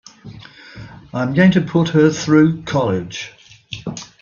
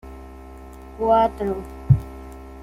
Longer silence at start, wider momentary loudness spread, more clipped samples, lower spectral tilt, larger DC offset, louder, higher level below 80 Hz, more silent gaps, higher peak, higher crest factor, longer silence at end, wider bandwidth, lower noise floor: first, 0.25 s vs 0.05 s; about the same, 24 LU vs 23 LU; neither; second, -6.5 dB/octave vs -9 dB/octave; neither; first, -15 LUFS vs -21 LUFS; second, -50 dBFS vs -38 dBFS; neither; first, 0 dBFS vs -4 dBFS; about the same, 18 dB vs 20 dB; first, 0.15 s vs 0 s; second, 7.2 kHz vs 12.5 kHz; about the same, -38 dBFS vs -40 dBFS